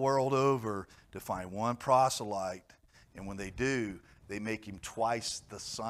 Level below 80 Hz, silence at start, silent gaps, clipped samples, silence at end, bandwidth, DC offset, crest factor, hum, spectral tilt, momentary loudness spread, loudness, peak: -60 dBFS; 0 s; none; under 0.1%; 0 s; 15.5 kHz; under 0.1%; 20 dB; none; -4.5 dB/octave; 17 LU; -33 LUFS; -14 dBFS